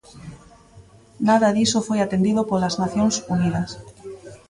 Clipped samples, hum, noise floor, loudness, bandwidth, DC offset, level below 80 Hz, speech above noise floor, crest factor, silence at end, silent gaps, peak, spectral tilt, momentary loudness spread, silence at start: under 0.1%; none; -48 dBFS; -21 LUFS; 11.5 kHz; under 0.1%; -52 dBFS; 28 dB; 16 dB; 0.15 s; none; -6 dBFS; -5 dB/octave; 22 LU; 0.15 s